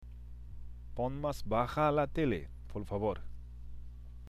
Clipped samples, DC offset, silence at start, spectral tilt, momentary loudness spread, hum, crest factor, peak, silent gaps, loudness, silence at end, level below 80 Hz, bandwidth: under 0.1%; under 0.1%; 0 s; -7.5 dB/octave; 21 LU; 60 Hz at -50 dBFS; 20 dB; -16 dBFS; none; -35 LUFS; 0 s; -46 dBFS; 14.5 kHz